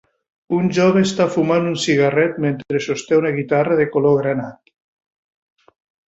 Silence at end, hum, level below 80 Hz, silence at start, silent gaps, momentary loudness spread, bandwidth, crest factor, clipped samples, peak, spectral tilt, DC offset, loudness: 1.6 s; none; -58 dBFS; 0.5 s; none; 7 LU; 8.2 kHz; 14 dB; under 0.1%; -4 dBFS; -6 dB/octave; under 0.1%; -17 LUFS